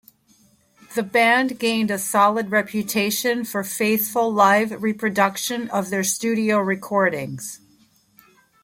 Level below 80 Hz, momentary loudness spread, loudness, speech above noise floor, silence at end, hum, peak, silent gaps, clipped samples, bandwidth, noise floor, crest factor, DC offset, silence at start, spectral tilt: -66 dBFS; 10 LU; -20 LUFS; 37 dB; 1.1 s; none; -4 dBFS; none; under 0.1%; 16.5 kHz; -58 dBFS; 18 dB; under 0.1%; 0.9 s; -3.5 dB/octave